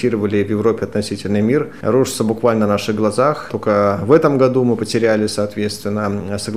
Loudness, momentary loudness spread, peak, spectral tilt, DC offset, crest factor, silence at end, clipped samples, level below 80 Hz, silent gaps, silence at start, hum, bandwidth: -17 LUFS; 8 LU; 0 dBFS; -6 dB/octave; 0.8%; 16 dB; 0 s; under 0.1%; -52 dBFS; none; 0 s; none; 16 kHz